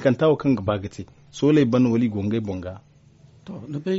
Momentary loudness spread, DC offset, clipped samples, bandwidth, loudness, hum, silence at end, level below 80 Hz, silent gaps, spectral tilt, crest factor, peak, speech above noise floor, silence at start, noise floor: 20 LU; under 0.1%; under 0.1%; 8 kHz; -22 LUFS; none; 0 s; -54 dBFS; none; -7 dB/octave; 16 dB; -6 dBFS; 31 dB; 0 s; -52 dBFS